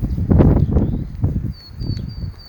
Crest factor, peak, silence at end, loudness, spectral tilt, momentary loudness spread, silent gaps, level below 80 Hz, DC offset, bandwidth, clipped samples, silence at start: 18 dB; 0 dBFS; 0 s; -18 LUFS; -10.5 dB/octave; 16 LU; none; -24 dBFS; under 0.1%; over 20 kHz; under 0.1%; 0 s